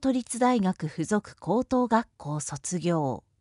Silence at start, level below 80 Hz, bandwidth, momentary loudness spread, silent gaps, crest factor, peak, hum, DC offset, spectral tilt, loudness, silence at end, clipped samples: 0 s; -58 dBFS; 11.5 kHz; 8 LU; none; 18 dB; -10 dBFS; none; under 0.1%; -5.5 dB/octave; -28 LUFS; 0.2 s; under 0.1%